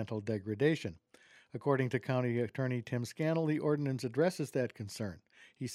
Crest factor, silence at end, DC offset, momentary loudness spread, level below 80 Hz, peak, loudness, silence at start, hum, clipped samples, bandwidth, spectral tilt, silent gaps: 18 dB; 0 s; under 0.1%; 10 LU; -72 dBFS; -16 dBFS; -35 LUFS; 0 s; none; under 0.1%; 14.5 kHz; -7 dB/octave; none